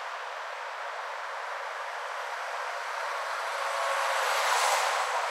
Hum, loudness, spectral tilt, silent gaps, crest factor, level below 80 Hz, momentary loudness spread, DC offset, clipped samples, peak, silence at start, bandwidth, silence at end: none; -30 LUFS; 5 dB/octave; none; 20 dB; under -90 dBFS; 11 LU; under 0.1%; under 0.1%; -12 dBFS; 0 s; 16 kHz; 0 s